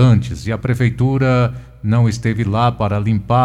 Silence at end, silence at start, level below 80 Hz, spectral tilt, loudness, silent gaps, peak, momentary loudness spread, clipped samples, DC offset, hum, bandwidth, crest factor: 0 s; 0 s; -36 dBFS; -7.5 dB/octave; -17 LUFS; none; 0 dBFS; 6 LU; under 0.1%; under 0.1%; none; 9.8 kHz; 14 dB